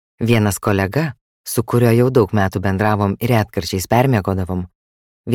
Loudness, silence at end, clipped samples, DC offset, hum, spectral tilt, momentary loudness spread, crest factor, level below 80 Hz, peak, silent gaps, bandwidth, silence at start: -17 LUFS; 0 s; under 0.1%; under 0.1%; none; -6.5 dB/octave; 11 LU; 16 dB; -44 dBFS; -2 dBFS; 1.21-1.44 s, 4.75-5.24 s; 17 kHz; 0.2 s